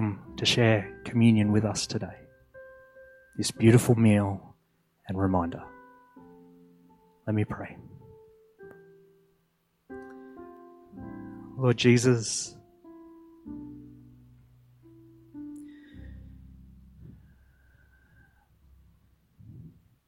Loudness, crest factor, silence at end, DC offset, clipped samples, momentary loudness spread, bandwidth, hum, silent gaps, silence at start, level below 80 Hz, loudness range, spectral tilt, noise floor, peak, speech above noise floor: -25 LUFS; 22 dB; 0.4 s; under 0.1%; under 0.1%; 27 LU; 14.5 kHz; none; none; 0 s; -58 dBFS; 23 LU; -5.5 dB/octave; -72 dBFS; -8 dBFS; 48 dB